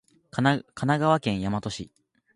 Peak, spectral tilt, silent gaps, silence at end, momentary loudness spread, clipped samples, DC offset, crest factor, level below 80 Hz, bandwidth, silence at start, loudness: -6 dBFS; -6 dB/octave; none; 0.5 s; 14 LU; under 0.1%; under 0.1%; 20 dB; -54 dBFS; 11 kHz; 0.35 s; -26 LUFS